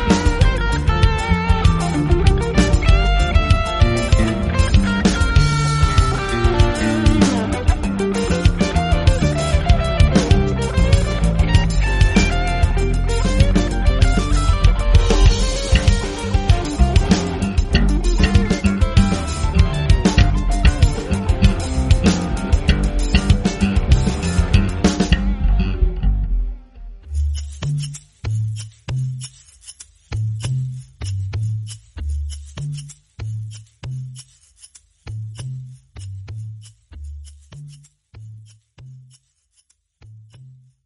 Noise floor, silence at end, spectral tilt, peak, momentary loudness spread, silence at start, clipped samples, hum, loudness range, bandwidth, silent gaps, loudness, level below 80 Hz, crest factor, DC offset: -63 dBFS; 0.45 s; -6 dB/octave; 0 dBFS; 15 LU; 0 s; under 0.1%; none; 16 LU; 11.5 kHz; none; -18 LUFS; -20 dBFS; 16 dB; under 0.1%